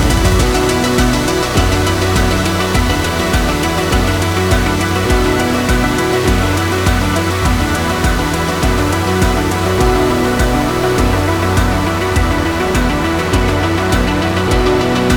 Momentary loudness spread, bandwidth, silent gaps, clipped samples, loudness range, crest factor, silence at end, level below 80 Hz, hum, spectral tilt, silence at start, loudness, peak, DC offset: 2 LU; 19 kHz; none; under 0.1%; 1 LU; 12 dB; 0 s; -20 dBFS; none; -5 dB/octave; 0 s; -14 LUFS; 0 dBFS; under 0.1%